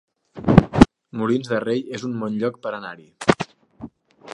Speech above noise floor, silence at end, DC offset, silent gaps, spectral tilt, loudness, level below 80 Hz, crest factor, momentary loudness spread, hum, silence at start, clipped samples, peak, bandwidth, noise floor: 17 dB; 0 s; under 0.1%; none; -7 dB/octave; -21 LUFS; -36 dBFS; 22 dB; 22 LU; none; 0.35 s; under 0.1%; 0 dBFS; 11 kHz; -41 dBFS